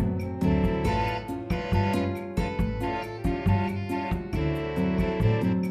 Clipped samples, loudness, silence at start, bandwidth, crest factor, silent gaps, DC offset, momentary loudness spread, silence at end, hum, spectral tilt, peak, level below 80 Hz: under 0.1%; -27 LUFS; 0 s; 14 kHz; 16 dB; none; under 0.1%; 6 LU; 0 s; none; -8 dB/octave; -12 dBFS; -36 dBFS